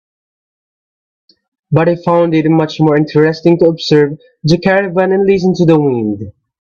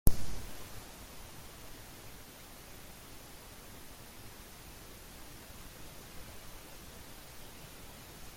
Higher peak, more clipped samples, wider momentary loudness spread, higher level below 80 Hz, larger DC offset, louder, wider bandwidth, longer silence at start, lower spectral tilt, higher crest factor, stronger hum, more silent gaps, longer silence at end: first, 0 dBFS vs -8 dBFS; neither; first, 7 LU vs 3 LU; about the same, -50 dBFS vs -46 dBFS; neither; first, -12 LUFS vs -49 LUFS; second, 7.2 kHz vs 16.5 kHz; first, 1.7 s vs 0.05 s; first, -7.5 dB/octave vs -4 dB/octave; second, 12 dB vs 30 dB; neither; neither; first, 0.3 s vs 0 s